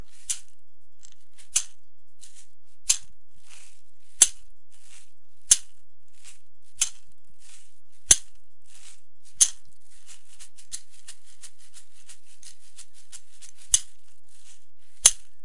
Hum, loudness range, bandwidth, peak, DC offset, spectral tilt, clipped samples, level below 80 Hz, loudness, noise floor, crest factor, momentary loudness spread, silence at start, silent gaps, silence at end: none; 15 LU; 12 kHz; 0 dBFS; 4%; 1.5 dB/octave; under 0.1%; -56 dBFS; -22 LUFS; -69 dBFS; 32 dB; 28 LU; 0.3 s; none; 0.3 s